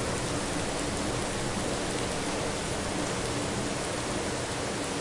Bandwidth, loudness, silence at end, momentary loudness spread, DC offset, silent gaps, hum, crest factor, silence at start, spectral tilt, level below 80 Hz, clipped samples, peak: 11.5 kHz; -31 LUFS; 0 s; 1 LU; under 0.1%; none; none; 16 dB; 0 s; -3.5 dB/octave; -46 dBFS; under 0.1%; -16 dBFS